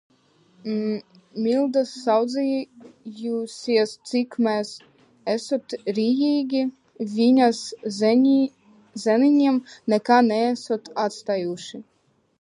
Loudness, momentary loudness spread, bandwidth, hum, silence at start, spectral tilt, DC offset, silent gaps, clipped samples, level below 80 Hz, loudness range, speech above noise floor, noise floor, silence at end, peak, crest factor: -22 LUFS; 16 LU; 11.5 kHz; none; 0.65 s; -5 dB/octave; under 0.1%; none; under 0.1%; -76 dBFS; 5 LU; 38 dB; -59 dBFS; 0.6 s; -4 dBFS; 20 dB